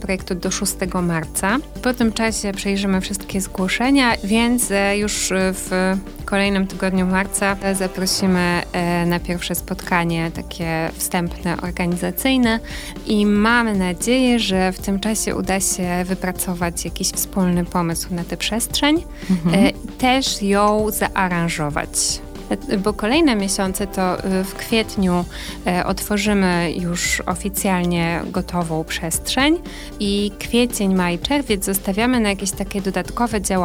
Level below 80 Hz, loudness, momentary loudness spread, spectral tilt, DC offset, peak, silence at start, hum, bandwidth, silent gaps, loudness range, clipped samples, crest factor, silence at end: -36 dBFS; -19 LUFS; 7 LU; -4 dB/octave; under 0.1%; 0 dBFS; 0 s; none; 16.5 kHz; none; 3 LU; under 0.1%; 18 dB; 0 s